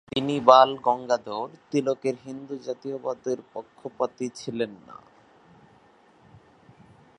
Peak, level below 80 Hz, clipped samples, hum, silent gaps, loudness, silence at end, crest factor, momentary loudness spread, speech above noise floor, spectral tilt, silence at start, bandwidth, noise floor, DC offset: 0 dBFS; -68 dBFS; under 0.1%; none; none; -25 LUFS; 2.25 s; 26 dB; 20 LU; 32 dB; -5 dB/octave; 0.15 s; 10.5 kHz; -57 dBFS; under 0.1%